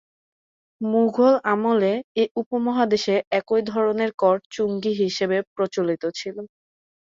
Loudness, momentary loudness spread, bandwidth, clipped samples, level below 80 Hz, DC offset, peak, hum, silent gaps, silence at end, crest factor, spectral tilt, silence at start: -22 LUFS; 9 LU; 7.6 kHz; under 0.1%; -68 dBFS; under 0.1%; -6 dBFS; none; 2.04-2.15 s, 2.31-2.35 s, 2.46-2.51 s, 3.27-3.31 s, 4.14-4.18 s, 4.46-4.50 s, 5.47-5.56 s; 0.55 s; 16 dB; -5.5 dB/octave; 0.8 s